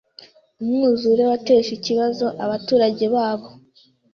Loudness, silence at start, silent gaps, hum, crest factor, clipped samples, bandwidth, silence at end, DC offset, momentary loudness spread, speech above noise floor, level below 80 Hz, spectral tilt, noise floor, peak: -19 LUFS; 0.6 s; none; none; 14 dB; under 0.1%; 6.8 kHz; 0.6 s; under 0.1%; 8 LU; 38 dB; -62 dBFS; -5.5 dB/octave; -56 dBFS; -6 dBFS